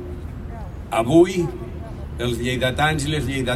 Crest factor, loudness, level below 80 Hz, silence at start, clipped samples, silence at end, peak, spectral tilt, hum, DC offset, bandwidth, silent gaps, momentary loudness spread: 18 dB; -20 LUFS; -36 dBFS; 0 s; under 0.1%; 0 s; -4 dBFS; -5.5 dB/octave; none; under 0.1%; 15 kHz; none; 18 LU